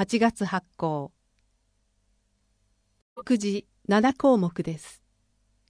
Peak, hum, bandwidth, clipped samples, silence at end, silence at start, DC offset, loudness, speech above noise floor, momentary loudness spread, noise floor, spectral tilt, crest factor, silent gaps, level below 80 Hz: -8 dBFS; 50 Hz at -50 dBFS; 10.5 kHz; under 0.1%; 0.75 s; 0 s; under 0.1%; -26 LUFS; 46 dB; 13 LU; -70 dBFS; -6 dB/octave; 20 dB; 3.02-3.16 s; -62 dBFS